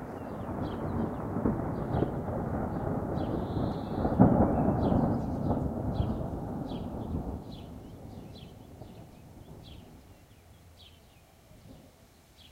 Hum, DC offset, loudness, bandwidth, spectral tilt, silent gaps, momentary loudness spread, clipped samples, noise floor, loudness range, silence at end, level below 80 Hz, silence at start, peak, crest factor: none; under 0.1%; -31 LUFS; 16 kHz; -9.5 dB/octave; none; 22 LU; under 0.1%; -58 dBFS; 21 LU; 0.05 s; -44 dBFS; 0 s; -6 dBFS; 26 dB